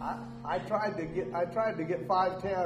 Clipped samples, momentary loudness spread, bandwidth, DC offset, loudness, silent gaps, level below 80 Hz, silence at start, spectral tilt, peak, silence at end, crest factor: under 0.1%; 7 LU; 13 kHz; under 0.1%; -32 LUFS; none; -58 dBFS; 0 s; -7 dB/octave; -16 dBFS; 0 s; 16 dB